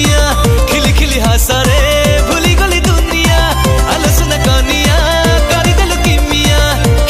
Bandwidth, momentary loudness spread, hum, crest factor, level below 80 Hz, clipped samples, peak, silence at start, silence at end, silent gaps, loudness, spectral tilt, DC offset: 15.5 kHz; 1 LU; none; 10 dB; -14 dBFS; under 0.1%; 0 dBFS; 0 s; 0 s; none; -10 LUFS; -4 dB/octave; 0.2%